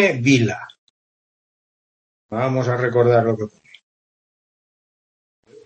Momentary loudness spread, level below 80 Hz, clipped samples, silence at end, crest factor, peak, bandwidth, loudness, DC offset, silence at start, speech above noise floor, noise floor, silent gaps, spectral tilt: 16 LU; -62 dBFS; under 0.1%; 2.2 s; 20 dB; -2 dBFS; 8.6 kHz; -18 LUFS; under 0.1%; 0 s; over 72 dB; under -90 dBFS; 0.78-2.29 s; -6.5 dB/octave